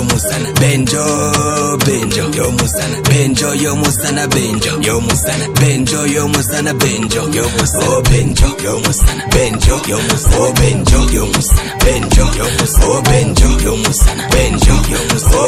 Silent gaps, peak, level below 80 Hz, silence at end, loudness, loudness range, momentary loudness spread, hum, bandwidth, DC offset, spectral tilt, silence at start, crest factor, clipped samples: none; 0 dBFS; -16 dBFS; 0 s; -12 LUFS; 1 LU; 3 LU; none; 16 kHz; under 0.1%; -4 dB/octave; 0 s; 12 dB; under 0.1%